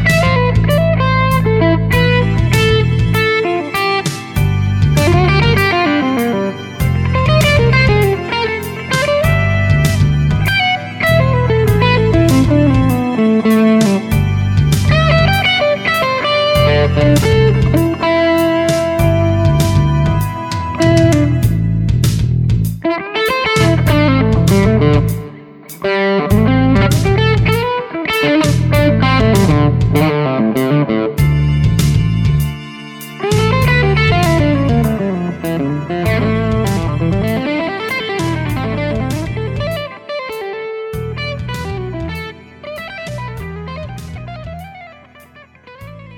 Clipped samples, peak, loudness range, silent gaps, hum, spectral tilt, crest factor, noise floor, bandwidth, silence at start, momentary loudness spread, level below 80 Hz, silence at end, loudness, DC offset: under 0.1%; 0 dBFS; 9 LU; none; none; -6.5 dB/octave; 12 dB; -42 dBFS; 18.5 kHz; 0 s; 12 LU; -26 dBFS; 0 s; -13 LUFS; under 0.1%